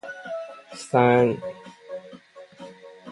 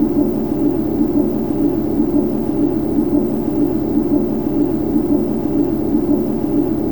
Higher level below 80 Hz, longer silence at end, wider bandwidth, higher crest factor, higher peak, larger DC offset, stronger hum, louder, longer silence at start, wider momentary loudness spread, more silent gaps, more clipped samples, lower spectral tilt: second, -66 dBFS vs -38 dBFS; about the same, 0 s vs 0 s; second, 11.5 kHz vs over 20 kHz; first, 22 dB vs 12 dB; about the same, -4 dBFS vs -4 dBFS; second, under 0.1% vs 2%; neither; second, -23 LUFS vs -17 LUFS; about the same, 0.05 s vs 0 s; first, 25 LU vs 1 LU; neither; neither; second, -6.5 dB/octave vs -9.5 dB/octave